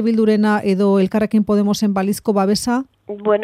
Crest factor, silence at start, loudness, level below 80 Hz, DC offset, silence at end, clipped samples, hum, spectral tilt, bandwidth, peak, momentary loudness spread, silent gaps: 12 dB; 0 s; -17 LUFS; -52 dBFS; under 0.1%; 0 s; under 0.1%; none; -6 dB/octave; 15 kHz; -4 dBFS; 6 LU; none